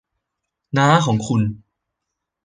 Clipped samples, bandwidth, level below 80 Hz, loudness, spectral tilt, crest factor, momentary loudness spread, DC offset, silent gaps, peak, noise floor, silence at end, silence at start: under 0.1%; 9.8 kHz; -52 dBFS; -18 LUFS; -6 dB/octave; 20 dB; 10 LU; under 0.1%; none; -2 dBFS; -80 dBFS; 0.85 s; 0.75 s